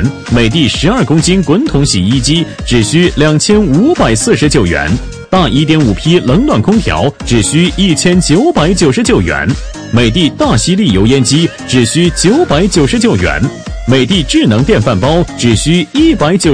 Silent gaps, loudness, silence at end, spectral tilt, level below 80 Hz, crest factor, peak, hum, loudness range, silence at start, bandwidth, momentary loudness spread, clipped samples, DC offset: none; -9 LUFS; 0 s; -5 dB/octave; -24 dBFS; 8 dB; 0 dBFS; none; 1 LU; 0 s; 11 kHz; 4 LU; 0.2%; 0.8%